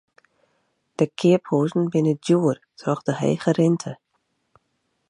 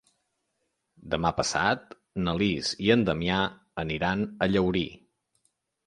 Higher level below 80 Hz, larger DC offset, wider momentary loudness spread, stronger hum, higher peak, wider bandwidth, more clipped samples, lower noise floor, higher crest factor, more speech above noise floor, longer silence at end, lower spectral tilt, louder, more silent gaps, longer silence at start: second, -68 dBFS vs -50 dBFS; neither; about the same, 9 LU vs 9 LU; neither; first, -4 dBFS vs -8 dBFS; about the same, 11 kHz vs 11 kHz; neither; second, -72 dBFS vs -78 dBFS; about the same, 18 dB vs 20 dB; about the same, 52 dB vs 52 dB; first, 1.15 s vs 0.9 s; first, -7 dB/octave vs -5 dB/octave; first, -22 LUFS vs -27 LUFS; neither; about the same, 1 s vs 1 s